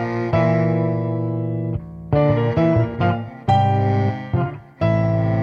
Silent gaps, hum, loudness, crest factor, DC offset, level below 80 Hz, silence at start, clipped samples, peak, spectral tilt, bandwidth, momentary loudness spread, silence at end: none; none; -20 LUFS; 14 dB; under 0.1%; -42 dBFS; 0 s; under 0.1%; -6 dBFS; -9.5 dB/octave; 6 kHz; 7 LU; 0 s